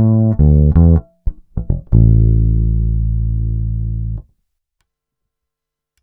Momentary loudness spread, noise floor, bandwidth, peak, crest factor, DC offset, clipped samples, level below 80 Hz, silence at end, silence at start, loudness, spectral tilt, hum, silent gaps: 15 LU; -82 dBFS; 1.6 kHz; 0 dBFS; 14 dB; under 0.1%; under 0.1%; -18 dBFS; 1.8 s; 0 s; -14 LUFS; -15 dB/octave; none; none